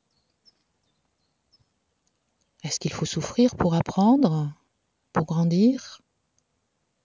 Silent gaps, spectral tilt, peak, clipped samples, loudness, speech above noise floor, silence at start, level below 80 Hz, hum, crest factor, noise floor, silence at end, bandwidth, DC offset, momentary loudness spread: none; -6.5 dB/octave; -8 dBFS; under 0.1%; -24 LUFS; 52 dB; 2.65 s; -54 dBFS; none; 18 dB; -74 dBFS; 1.1 s; 7.8 kHz; under 0.1%; 12 LU